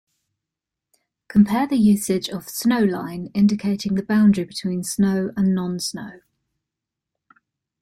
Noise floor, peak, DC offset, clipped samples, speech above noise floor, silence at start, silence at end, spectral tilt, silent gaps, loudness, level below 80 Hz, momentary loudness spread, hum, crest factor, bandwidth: -85 dBFS; -4 dBFS; under 0.1%; under 0.1%; 66 dB; 1.3 s; 1.65 s; -6 dB/octave; none; -20 LUFS; -56 dBFS; 10 LU; none; 18 dB; 14 kHz